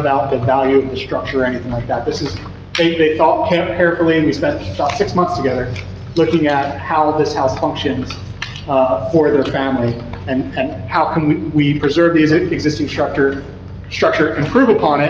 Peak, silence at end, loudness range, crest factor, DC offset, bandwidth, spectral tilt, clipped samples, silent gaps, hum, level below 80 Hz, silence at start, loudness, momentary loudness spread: -2 dBFS; 0 s; 2 LU; 14 dB; under 0.1%; 7.6 kHz; -6.5 dB/octave; under 0.1%; none; none; -40 dBFS; 0 s; -16 LUFS; 10 LU